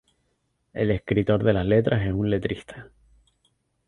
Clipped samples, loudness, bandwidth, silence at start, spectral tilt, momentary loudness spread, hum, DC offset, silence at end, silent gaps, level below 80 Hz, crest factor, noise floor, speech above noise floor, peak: under 0.1%; -24 LUFS; 10 kHz; 0.75 s; -9 dB/octave; 17 LU; none; under 0.1%; 1.05 s; none; -44 dBFS; 20 dB; -72 dBFS; 49 dB; -6 dBFS